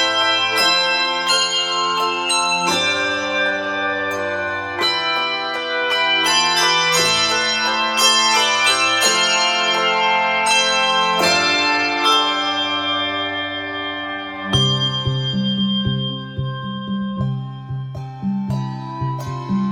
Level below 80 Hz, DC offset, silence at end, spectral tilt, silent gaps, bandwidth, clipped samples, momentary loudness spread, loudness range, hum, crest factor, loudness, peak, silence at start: -50 dBFS; under 0.1%; 0 s; -2.5 dB/octave; none; 16.5 kHz; under 0.1%; 11 LU; 8 LU; none; 16 dB; -17 LUFS; -2 dBFS; 0 s